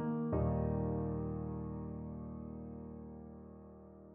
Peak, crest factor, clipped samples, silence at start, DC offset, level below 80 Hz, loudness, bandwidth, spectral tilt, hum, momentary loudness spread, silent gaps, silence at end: -22 dBFS; 18 dB; under 0.1%; 0 s; under 0.1%; -50 dBFS; -40 LUFS; 3 kHz; -12 dB/octave; none; 18 LU; none; 0 s